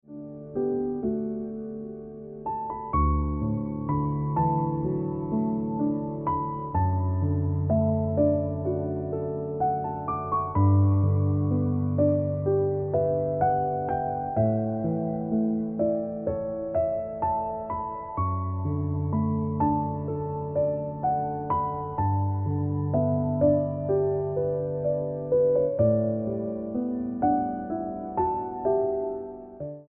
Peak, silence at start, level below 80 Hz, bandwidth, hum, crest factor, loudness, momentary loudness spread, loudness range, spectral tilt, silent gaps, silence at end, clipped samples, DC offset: -10 dBFS; 0.1 s; -44 dBFS; 2.5 kHz; none; 16 dB; -27 LUFS; 8 LU; 4 LU; -13 dB/octave; none; 0.05 s; under 0.1%; under 0.1%